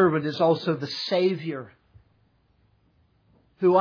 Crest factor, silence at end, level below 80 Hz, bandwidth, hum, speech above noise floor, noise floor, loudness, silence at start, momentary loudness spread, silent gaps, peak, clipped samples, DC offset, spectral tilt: 18 dB; 0 s; -68 dBFS; 5.4 kHz; none; 41 dB; -65 dBFS; -25 LUFS; 0 s; 13 LU; none; -8 dBFS; under 0.1%; under 0.1%; -7 dB/octave